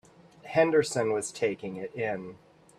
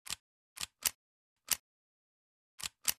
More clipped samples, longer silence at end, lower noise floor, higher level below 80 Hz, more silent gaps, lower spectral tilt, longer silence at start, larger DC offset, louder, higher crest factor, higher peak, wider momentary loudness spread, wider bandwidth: neither; first, 0.4 s vs 0.05 s; second, -49 dBFS vs under -90 dBFS; about the same, -68 dBFS vs -70 dBFS; second, none vs 0.20-0.56 s, 0.95-1.36 s, 1.59-2.58 s; first, -4.5 dB/octave vs 2 dB/octave; first, 0.45 s vs 0.1 s; neither; first, -29 LUFS vs -38 LUFS; second, 20 dB vs 30 dB; about the same, -10 dBFS vs -12 dBFS; first, 13 LU vs 9 LU; second, 13.5 kHz vs 15.5 kHz